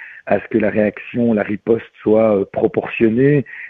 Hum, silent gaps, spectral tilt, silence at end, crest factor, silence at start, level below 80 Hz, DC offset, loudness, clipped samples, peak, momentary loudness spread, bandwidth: none; none; -11 dB/octave; 0 s; 14 dB; 0 s; -50 dBFS; under 0.1%; -17 LUFS; under 0.1%; -2 dBFS; 6 LU; 4.2 kHz